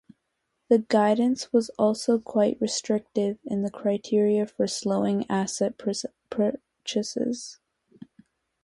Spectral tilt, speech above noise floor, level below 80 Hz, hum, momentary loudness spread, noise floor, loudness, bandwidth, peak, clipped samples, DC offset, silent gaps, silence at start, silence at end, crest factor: -5 dB/octave; 53 dB; -68 dBFS; none; 8 LU; -78 dBFS; -26 LUFS; 11.5 kHz; -8 dBFS; under 0.1%; under 0.1%; none; 0.7 s; 1.1 s; 18 dB